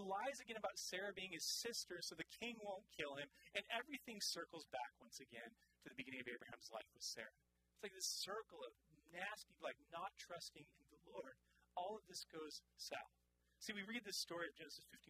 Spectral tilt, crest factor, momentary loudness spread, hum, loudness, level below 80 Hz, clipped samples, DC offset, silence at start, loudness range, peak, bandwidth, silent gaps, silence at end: -1.5 dB/octave; 24 dB; 12 LU; none; -50 LUFS; -84 dBFS; under 0.1%; under 0.1%; 0 s; 6 LU; -30 dBFS; 15.5 kHz; none; 0.05 s